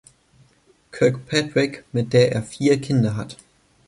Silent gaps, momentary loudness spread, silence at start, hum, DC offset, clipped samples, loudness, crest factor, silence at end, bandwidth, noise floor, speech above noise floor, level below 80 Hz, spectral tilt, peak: none; 10 LU; 0.95 s; none; under 0.1%; under 0.1%; -21 LUFS; 18 dB; 0.55 s; 11.5 kHz; -58 dBFS; 38 dB; -56 dBFS; -6 dB/octave; -4 dBFS